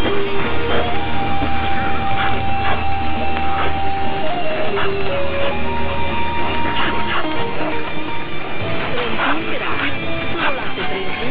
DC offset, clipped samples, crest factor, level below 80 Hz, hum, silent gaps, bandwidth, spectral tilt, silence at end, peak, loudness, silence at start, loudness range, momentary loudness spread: 20%; under 0.1%; 14 dB; -34 dBFS; none; none; 5.2 kHz; -8.5 dB/octave; 0 s; -4 dBFS; -21 LUFS; 0 s; 1 LU; 4 LU